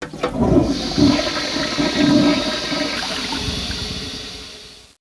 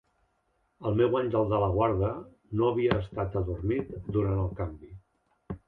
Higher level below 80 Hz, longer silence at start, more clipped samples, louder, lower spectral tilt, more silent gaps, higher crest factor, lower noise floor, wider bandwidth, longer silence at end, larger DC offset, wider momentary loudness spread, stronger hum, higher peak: first, -36 dBFS vs -44 dBFS; second, 0 s vs 0.8 s; neither; first, -19 LUFS vs -29 LUFS; second, -4.5 dB/octave vs -10.5 dB/octave; neither; about the same, 18 dB vs 20 dB; second, -40 dBFS vs -73 dBFS; first, 11 kHz vs 4.6 kHz; about the same, 0.2 s vs 0.1 s; neither; about the same, 13 LU vs 11 LU; neither; first, -2 dBFS vs -10 dBFS